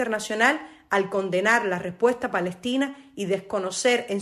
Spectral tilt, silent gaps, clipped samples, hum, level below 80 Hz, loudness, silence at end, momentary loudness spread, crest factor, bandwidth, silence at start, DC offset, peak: -3.5 dB/octave; none; under 0.1%; none; -66 dBFS; -24 LUFS; 0 s; 7 LU; 18 dB; 13.5 kHz; 0 s; under 0.1%; -6 dBFS